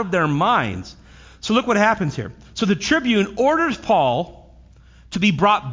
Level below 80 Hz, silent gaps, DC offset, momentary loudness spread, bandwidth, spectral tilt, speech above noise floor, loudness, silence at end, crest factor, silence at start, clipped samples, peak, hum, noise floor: -46 dBFS; none; under 0.1%; 14 LU; 7.6 kHz; -5.5 dB/octave; 28 dB; -19 LUFS; 0 s; 16 dB; 0 s; under 0.1%; -4 dBFS; none; -47 dBFS